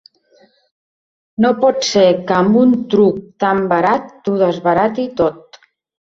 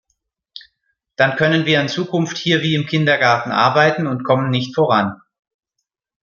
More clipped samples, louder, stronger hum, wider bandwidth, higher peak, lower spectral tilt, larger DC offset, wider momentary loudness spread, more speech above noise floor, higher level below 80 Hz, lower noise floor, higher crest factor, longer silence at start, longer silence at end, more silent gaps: neither; about the same, -14 LUFS vs -16 LUFS; neither; about the same, 7.8 kHz vs 7.2 kHz; about the same, -2 dBFS vs 0 dBFS; about the same, -5.5 dB/octave vs -5.5 dB/octave; neither; about the same, 6 LU vs 6 LU; second, 39 dB vs 61 dB; first, -54 dBFS vs -60 dBFS; second, -53 dBFS vs -78 dBFS; about the same, 14 dB vs 18 dB; first, 1.4 s vs 0.55 s; second, 0.7 s vs 1.1 s; neither